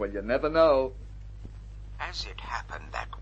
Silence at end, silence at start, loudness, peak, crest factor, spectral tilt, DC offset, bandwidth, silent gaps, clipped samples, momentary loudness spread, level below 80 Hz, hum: 0 s; 0 s; -28 LUFS; -8 dBFS; 20 dB; -5.5 dB/octave; under 0.1%; 8.2 kHz; none; under 0.1%; 23 LU; -42 dBFS; 50 Hz at -45 dBFS